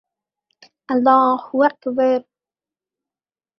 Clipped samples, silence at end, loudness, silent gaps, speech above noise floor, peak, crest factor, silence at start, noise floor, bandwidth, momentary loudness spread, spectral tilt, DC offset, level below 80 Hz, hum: under 0.1%; 1.4 s; -17 LUFS; none; over 73 dB; -2 dBFS; 18 dB; 0.9 s; under -90 dBFS; 6 kHz; 7 LU; -7 dB/octave; under 0.1%; -70 dBFS; none